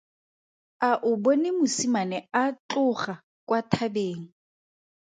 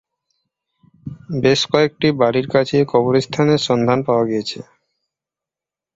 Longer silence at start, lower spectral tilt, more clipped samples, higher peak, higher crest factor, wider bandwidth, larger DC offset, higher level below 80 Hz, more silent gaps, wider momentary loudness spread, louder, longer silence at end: second, 0.8 s vs 1.05 s; about the same, -4.5 dB/octave vs -5.5 dB/octave; neither; second, -6 dBFS vs -2 dBFS; first, 22 dB vs 16 dB; first, 9.4 kHz vs 8 kHz; neither; second, -70 dBFS vs -54 dBFS; first, 2.59-2.69 s, 3.23-3.47 s vs none; second, 9 LU vs 14 LU; second, -26 LUFS vs -17 LUFS; second, 0.8 s vs 1.35 s